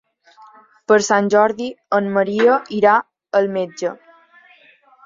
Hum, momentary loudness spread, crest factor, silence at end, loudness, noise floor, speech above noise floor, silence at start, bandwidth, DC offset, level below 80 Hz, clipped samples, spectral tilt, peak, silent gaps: none; 11 LU; 18 dB; 1.1 s; -17 LUFS; -51 dBFS; 35 dB; 0.9 s; 7.6 kHz; under 0.1%; -66 dBFS; under 0.1%; -4.5 dB/octave; -2 dBFS; none